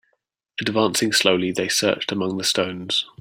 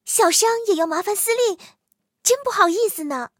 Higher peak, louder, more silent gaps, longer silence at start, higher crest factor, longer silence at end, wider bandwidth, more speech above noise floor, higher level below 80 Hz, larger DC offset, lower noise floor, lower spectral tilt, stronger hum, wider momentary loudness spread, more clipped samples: about the same, -2 dBFS vs 0 dBFS; about the same, -21 LUFS vs -19 LUFS; neither; first, 0.6 s vs 0.05 s; about the same, 20 dB vs 20 dB; about the same, 0.15 s vs 0.1 s; about the same, 16.5 kHz vs 17 kHz; first, 50 dB vs 28 dB; first, -62 dBFS vs -74 dBFS; neither; first, -72 dBFS vs -48 dBFS; first, -3 dB/octave vs 0 dB/octave; neither; about the same, 7 LU vs 7 LU; neither